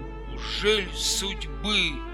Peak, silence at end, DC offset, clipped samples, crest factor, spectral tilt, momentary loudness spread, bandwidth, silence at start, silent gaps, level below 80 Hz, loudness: -10 dBFS; 0 s; under 0.1%; under 0.1%; 16 dB; -2 dB/octave; 10 LU; 17 kHz; 0 s; none; -36 dBFS; -25 LUFS